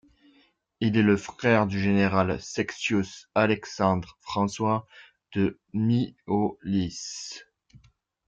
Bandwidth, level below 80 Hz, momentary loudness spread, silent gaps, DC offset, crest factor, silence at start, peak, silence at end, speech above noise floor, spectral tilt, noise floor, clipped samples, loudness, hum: 7.8 kHz; -58 dBFS; 10 LU; none; under 0.1%; 20 dB; 0.8 s; -8 dBFS; 0.5 s; 38 dB; -6 dB/octave; -64 dBFS; under 0.1%; -26 LUFS; none